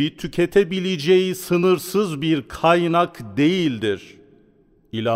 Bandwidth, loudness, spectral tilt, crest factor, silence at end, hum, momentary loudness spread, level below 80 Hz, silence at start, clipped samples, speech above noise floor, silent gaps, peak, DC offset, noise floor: 16 kHz; -20 LUFS; -6 dB/octave; 16 dB; 0 s; none; 7 LU; -52 dBFS; 0 s; under 0.1%; 37 dB; none; -4 dBFS; under 0.1%; -56 dBFS